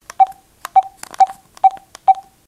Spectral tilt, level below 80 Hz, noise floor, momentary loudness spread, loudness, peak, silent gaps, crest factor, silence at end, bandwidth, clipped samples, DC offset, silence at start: -1 dB/octave; -62 dBFS; -36 dBFS; 3 LU; -17 LUFS; -2 dBFS; none; 16 dB; 0.25 s; 14 kHz; under 0.1%; under 0.1%; 0.2 s